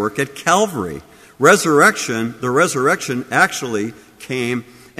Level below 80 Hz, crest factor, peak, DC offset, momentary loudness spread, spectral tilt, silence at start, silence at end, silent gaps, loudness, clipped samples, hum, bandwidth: -56 dBFS; 18 dB; 0 dBFS; under 0.1%; 14 LU; -4 dB/octave; 0 s; 0.35 s; none; -16 LUFS; under 0.1%; none; 15.5 kHz